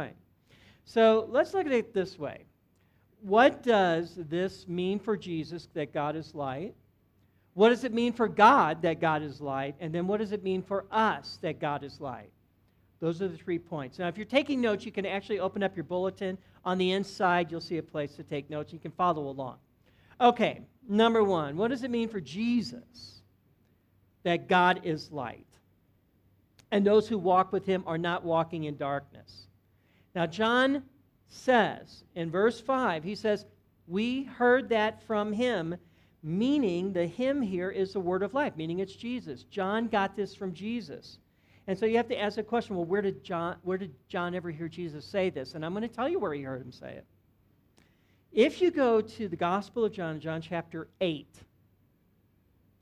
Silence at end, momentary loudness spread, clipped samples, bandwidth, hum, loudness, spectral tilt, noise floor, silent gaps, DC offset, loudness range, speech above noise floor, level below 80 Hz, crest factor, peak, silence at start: 1.4 s; 14 LU; under 0.1%; 11.5 kHz; none; -29 LUFS; -6.5 dB/octave; -68 dBFS; none; under 0.1%; 7 LU; 38 dB; -66 dBFS; 24 dB; -6 dBFS; 0 s